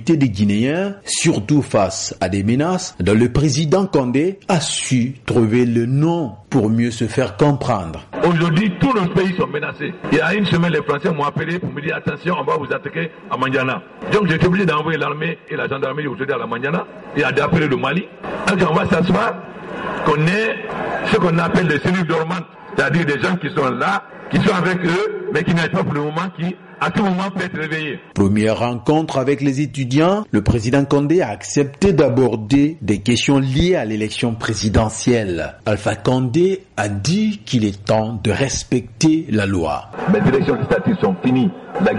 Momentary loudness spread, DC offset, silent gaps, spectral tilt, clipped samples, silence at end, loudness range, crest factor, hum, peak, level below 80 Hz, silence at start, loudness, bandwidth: 7 LU; under 0.1%; none; -5.5 dB/octave; under 0.1%; 0 s; 3 LU; 12 dB; none; -4 dBFS; -42 dBFS; 0 s; -18 LUFS; 11.5 kHz